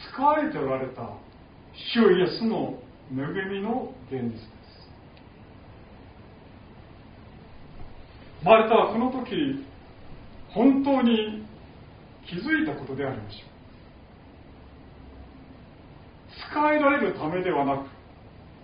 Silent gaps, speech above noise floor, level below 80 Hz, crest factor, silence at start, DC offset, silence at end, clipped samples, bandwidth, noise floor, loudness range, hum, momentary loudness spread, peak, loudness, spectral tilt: none; 25 dB; -52 dBFS; 24 dB; 0 s; under 0.1%; 0.1 s; under 0.1%; 5.2 kHz; -49 dBFS; 15 LU; none; 27 LU; -4 dBFS; -25 LUFS; -4 dB/octave